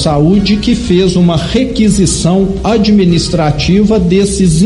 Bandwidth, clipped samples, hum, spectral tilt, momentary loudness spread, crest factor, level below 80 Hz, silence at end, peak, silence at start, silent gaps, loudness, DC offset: 11.5 kHz; under 0.1%; none; -6 dB/octave; 3 LU; 8 dB; -24 dBFS; 0 s; 0 dBFS; 0 s; none; -10 LUFS; under 0.1%